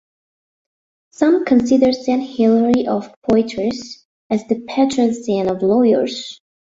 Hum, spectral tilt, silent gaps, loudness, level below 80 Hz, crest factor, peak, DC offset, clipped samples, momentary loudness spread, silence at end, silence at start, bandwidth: none; -6 dB/octave; 3.16-3.22 s, 4.05-4.30 s; -17 LUFS; -52 dBFS; 16 dB; -2 dBFS; under 0.1%; under 0.1%; 9 LU; 0.3 s; 1.2 s; 8 kHz